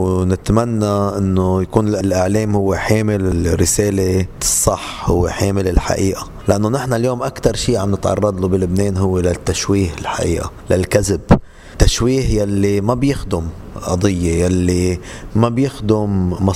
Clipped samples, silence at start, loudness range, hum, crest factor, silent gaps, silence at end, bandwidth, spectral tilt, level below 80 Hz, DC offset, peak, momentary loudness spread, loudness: under 0.1%; 0 s; 2 LU; none; 16 dB; none; 0 s; 16 kHz; -5.5 dB/octave; -28 dBFS; under 0.1%; 0 dBFS; 5 LU; -17 LUFS